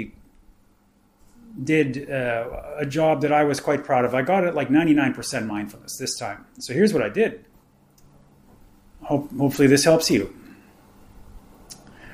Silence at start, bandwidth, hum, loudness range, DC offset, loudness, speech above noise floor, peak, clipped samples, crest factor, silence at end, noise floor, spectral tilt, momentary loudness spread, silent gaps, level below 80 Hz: 0 s; 15.5 kHz; none; 5 LU; under 0.1%; -22 LUFS; 39 dB; -4 dBFS; under 0.1%; 20 dB; 0 s; -60 dBFS; -5 dB/octave; 16 LU; none; -52 dBFS